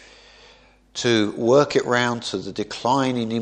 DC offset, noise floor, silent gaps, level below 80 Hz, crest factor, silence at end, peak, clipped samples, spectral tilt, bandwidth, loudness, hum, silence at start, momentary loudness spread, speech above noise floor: under 0.1%; -52 dBFS; none; -58 dBFS; 18 dB; 0 s; -4 dBFS; under 0.1%; -4.5 dB/octave; 10 kHz; -21 LUFS; none; 0.95 s; 11 LU; 32 dB